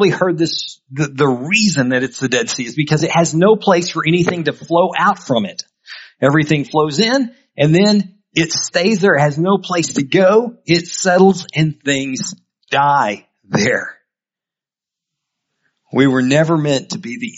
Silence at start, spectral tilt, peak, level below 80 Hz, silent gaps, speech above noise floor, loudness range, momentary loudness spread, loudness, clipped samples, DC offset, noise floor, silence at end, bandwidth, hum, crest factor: 0 s; -5 dB/octave; 0 dBFS; -56 dBFS; none; 73 dB; 5 LU; 10 LU; -15 LUFS; under 0.1%; under 0.1%; -88 dBFS; 0.05 s; 8 kHz; none; 16 dB